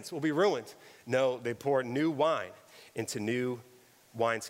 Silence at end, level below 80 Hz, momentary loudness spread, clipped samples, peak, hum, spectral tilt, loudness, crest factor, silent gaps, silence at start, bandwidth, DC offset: 0 s; -78 dBFS; 16 LU; under 0.1%; -16 dBFS; none; -5 dB/octave; -31 LUFS; 16 dB; none; 0 s; 16 kHz; under 0.1%